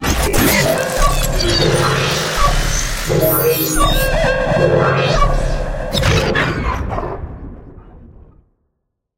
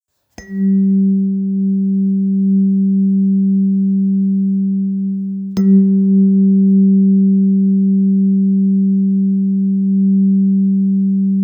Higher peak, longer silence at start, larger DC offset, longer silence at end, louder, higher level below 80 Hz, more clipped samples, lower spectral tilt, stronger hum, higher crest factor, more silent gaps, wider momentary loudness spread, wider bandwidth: first, 0 dBFS vs -4 dBFS; second, 0 s vs 0.4 s; neither; first, 1.1 s vs 0 s; about the same, -15 LUFS vs -14 LUFS; first, -22 dBFS vs -60 dBFS; neither; second, -4 dB/octave vs -12 dB/octave; neither; about the same, 14 dB vs 10 dB; neither; first, 9 LU vs 5 LU; first, 17 kHz vs 2 kHz